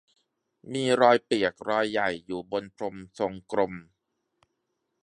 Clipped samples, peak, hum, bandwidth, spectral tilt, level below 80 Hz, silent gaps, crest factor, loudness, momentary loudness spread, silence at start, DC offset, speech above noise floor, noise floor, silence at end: under 0.1%; -4 dBFS; none; 11 kHz; -5 dB/octave; -66 dBFS; none; 24 dB; -27 LUFS; 15 LU; 0.65 s; under 0.1%; 53 dB; -79 dBFS; 1.2 s